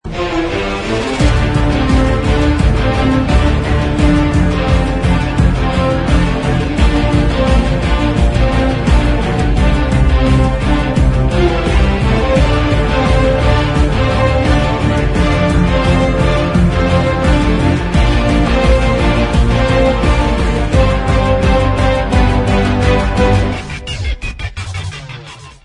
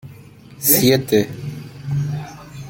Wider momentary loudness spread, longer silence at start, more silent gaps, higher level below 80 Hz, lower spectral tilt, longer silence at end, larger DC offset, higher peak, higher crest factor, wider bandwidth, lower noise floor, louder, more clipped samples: second, 5 LU vs 18 LU; about the same, 0.05 s vs 0.05 s; neither; first, -16 dBFS vs -50 dBFS; first, -6.5 dB/octave vs -4.5 dB/octave; first, 0.15 s vs 0 s; neither; about the same, 0 dBFS vs 0 dBFS; second, 12 dB vs 20 dB; second, 10.5 kHz vs 17 kHz; second, -32 dBFS vs -41 dBFS; first, -13 LUFS vs -17 LUFS; neither